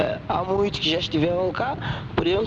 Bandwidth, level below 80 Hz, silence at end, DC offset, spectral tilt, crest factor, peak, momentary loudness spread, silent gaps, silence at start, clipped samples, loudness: 7.8 kHz; -44 dBFS; 0 s; under 0.1%; -6 dB/octave; 14 dB; -10 dBFS; 5 LU; none; 0 s; under 0.1%; -24 LUFS